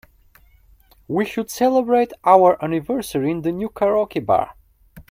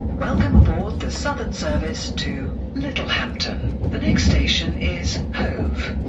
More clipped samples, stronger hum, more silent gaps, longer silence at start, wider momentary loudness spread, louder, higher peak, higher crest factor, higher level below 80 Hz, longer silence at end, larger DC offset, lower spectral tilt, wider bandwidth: neither; neither; neither; first, 1.1 s vs 0 s; about the same, 10 LU vs 8 LU; first, -19 LUFS vs -22 LUFS; about the same, 0 dBFS vs -2 dBFS; about the same, 20 dB vs 20 dB; second, -52 dBFS vs -24 dBFS; about the same, 0.1 s vs 0 s; neither; about the same, -6 dB/octave vs -5.5 dB/octave; first, 16.5 kHz vs 8 kHz